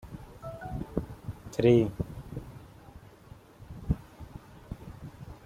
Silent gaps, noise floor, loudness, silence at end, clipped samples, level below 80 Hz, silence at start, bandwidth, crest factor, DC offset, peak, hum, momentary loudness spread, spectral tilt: none; -53 dBFS; -31 LUFS; 0 s; under 0.1%; -48 dBFS; 0.05 s; 15.5 kHz; 24 dB; under 0.1%; -10 dBFS; none; 28 LU; -8 dB/octave